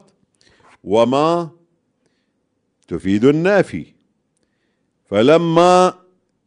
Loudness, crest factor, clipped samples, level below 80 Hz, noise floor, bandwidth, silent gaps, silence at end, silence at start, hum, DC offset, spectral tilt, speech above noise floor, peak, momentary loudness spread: -15 LUFS; 18 dB; under 0.1%; -56 dBFS; -69 dBFS; 10.5 kHz; none; 0.55 s; 0.85 s; none; under 0.1%; -6 dB/octave; 54 dB; 0 dBFS; 17 LU